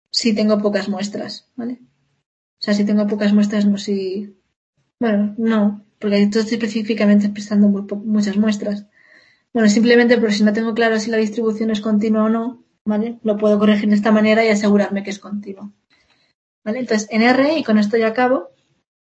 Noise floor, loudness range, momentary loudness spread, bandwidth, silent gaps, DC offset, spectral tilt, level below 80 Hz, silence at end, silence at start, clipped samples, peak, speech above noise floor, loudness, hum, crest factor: -59 dBFS; 4 LU; 14 LU; 8.2 kHz; 2.26-2.57 s, 4.56-4.73 s, 12.81-12.85 s, 16.35-16.62 s; under 0.1%; -6 dB/octave; -64 dBFS; 0.7 s; 0.15 s; under 0.1%; -2 dBFS; 43 dB; -17 LUFS; none; 16 dB